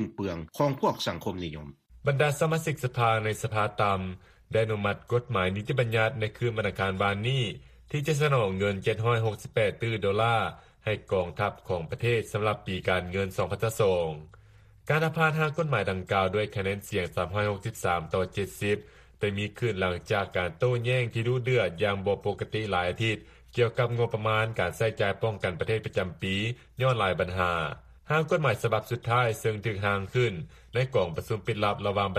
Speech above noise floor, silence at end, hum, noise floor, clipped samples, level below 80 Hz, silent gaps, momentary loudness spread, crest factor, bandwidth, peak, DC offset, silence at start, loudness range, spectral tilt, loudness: 27 dB; 0 s; none; -55 dBFS; under 0.1%; -54 dBFS; none; 7 LU; 18 dB; 15 kHz; -10 dBFS; under 0.1%; 0 s; 2 LU; -6 dB/octave; -28 LUFS